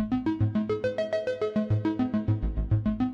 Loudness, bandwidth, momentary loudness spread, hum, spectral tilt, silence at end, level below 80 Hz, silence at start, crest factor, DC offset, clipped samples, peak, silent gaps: -28 LUFS; 6.8 kHz; 2 LU; none; -9 dB/octave; 0 s; -38 dBFS; 0 s; 12 dB; under 0.1%; under 0.1%; -14 dBFS; none